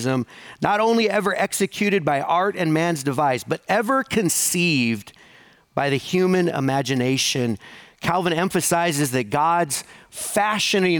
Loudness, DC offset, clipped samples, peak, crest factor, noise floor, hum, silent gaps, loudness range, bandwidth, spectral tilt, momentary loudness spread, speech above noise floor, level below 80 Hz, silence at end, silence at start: -21 LUFS; under 0.1%; under 0.1%; -4 dBFS; 18 dB; -52 dBFS; none; none; 2 LU; over 20 kHz; -4 dB/octave; 7 LU; 31 dB; -60 dBFS; 0 s; 0 s